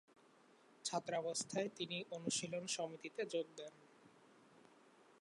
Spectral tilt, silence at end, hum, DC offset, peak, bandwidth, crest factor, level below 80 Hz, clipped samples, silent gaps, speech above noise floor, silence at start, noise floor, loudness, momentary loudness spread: -3 dB/octave; 0.1 s; none; under 0.1%; -26 dBFS; 11 kHz; 20 dB; under -90 dBFS; under 0.1%; none; 25 dB; 0.7 s; -69 dBFS; -43 LUFS; 6 LU